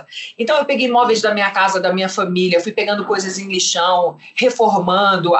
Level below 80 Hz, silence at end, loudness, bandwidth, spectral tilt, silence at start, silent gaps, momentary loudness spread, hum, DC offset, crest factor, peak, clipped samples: -66 dBFS; 0 s; -16 LUFS; 8.4 kHz; -3.5 dB/octave; 0.1 s; none; 6 LU; none; under 0.1%; 12 dB; -4 dBFS; under 0.1%